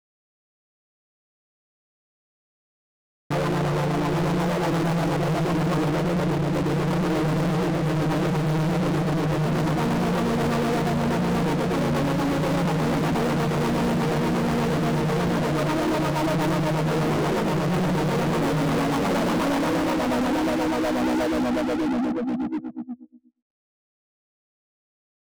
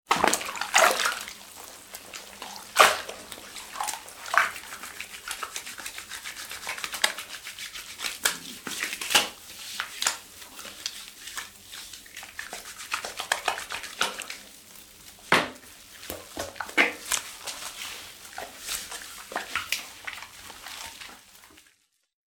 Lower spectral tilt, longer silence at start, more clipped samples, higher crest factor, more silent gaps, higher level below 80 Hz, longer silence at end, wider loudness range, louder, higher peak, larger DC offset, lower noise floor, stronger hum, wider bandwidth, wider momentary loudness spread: first, -6.5 dB/octave vs 0 dB/octave; first, 3.3 s vs 0.1 s; neither; second, 4 dB vs 30 dB; neither; first, -44 dBFS vs -64 dBFS; first, 2.1 s vs 0.8 s; second, 5 LU vs 8 LU; first, -24 LUFS vs -28 LUFS; second, -20 dBFS vs -2 dBFS; first, 0.2% vs under 0.1%; second, -44 dBFS vs -66 dBFS; neither; about the same, over 20 kHz vs 19.5 kHz; second, 1 LU vs 18 LU